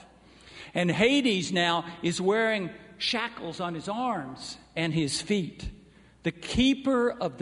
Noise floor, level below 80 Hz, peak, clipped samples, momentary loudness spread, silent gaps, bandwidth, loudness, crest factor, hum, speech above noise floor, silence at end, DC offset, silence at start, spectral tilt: -53 dBFS; -50 dBFS; -8 dBFS; under 0.1%; 13 LU; none; 11 kHz; -27 LUFS; 20 dB; none; 26 dB; 0 s; under 0.1%; 0 s; -4.5 dB/octave